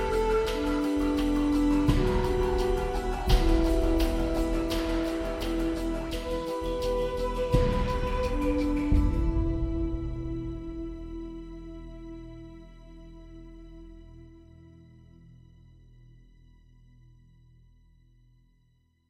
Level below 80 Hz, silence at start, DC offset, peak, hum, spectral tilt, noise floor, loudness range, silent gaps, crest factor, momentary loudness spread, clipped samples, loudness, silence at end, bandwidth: -32 dBFS; 0 s; under 0.1%; -10 dBFS; none; -6.5 dB/octave; -67 dBFS; 20 LU; none; 18 dB; 23 LU; under 0.1%; -29 LUFS; 3.75 s; 16 kHz